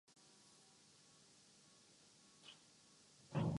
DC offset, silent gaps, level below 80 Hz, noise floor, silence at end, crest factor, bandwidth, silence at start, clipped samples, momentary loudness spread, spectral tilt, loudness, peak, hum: under 0.1%; none; -72 dBFS; -69 dBFS; 0 s; 22 dB; 11.5 kHz; 2.45 s; under 0.1%; 11 LU; -6.5 dB/octave; -56 LUFS; -30 dBFS; none